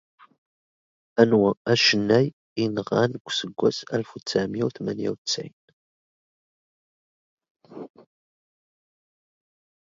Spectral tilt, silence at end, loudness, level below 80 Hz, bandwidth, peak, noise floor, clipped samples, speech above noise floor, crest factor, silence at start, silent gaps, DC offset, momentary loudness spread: -5 dB/octave; 2.05 s; -23 LUFS; -64 dBFS; 7.8 kHz; -2 dBFS; under -90 dBFS; under 0.1%; over 67 dB; 26 dB; 1.15 s; 1.57-1.65 s, 2.33-2.56 s, 3.20-3.25 s, 5.18-5.25 s, 5.53-7.37 s, 7.50-7.55 s; under 0.1%; 12 LU